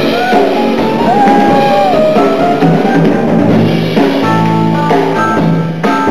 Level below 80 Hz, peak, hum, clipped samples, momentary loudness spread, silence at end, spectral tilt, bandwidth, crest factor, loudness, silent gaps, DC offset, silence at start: -42 dBFS; 0 dBFS; none; 0.3%; 3 LU; 0 s; -7 dB/octave; 14.5 kHz; 10 dB; -9 LUFS; none; 5%; 0 s